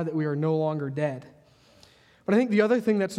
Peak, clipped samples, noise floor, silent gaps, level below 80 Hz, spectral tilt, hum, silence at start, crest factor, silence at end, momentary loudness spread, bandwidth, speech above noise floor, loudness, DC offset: -8 dBFS; under 0.1%; -57 dBFS; none; -70 dBFS; -7.5 dB/octave; none; 0 s; 18 dB; 0 s; 9 LU; 12.5 kHz; 32 dB; -25 LUFS; under 0.1%